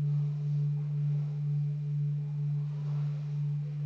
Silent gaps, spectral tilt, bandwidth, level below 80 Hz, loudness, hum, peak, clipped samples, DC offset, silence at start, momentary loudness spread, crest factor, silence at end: none; -10.5 dB/octave; 3 kHz; -78 dBFS; -33 LUFS; none; -24 dBFS; under 0.1%; under 0.1%; 0 s; 3 LU; 6 dB; 0 s